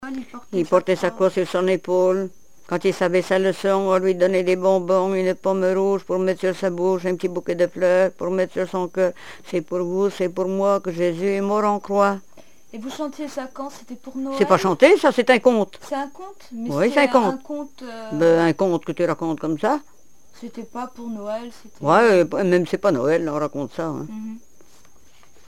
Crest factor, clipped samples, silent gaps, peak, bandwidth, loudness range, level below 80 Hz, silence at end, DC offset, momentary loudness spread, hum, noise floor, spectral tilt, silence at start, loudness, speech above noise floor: 20 dB; under 0.1%; none; 0 dBFS; 14.5 kHz; 4 LU; -64 dBFS; 1.1 s; 0.7%; 16 LU; none; -54 dBFS; -6 dB/octave; 0 s; -20 LUFS; 34 dB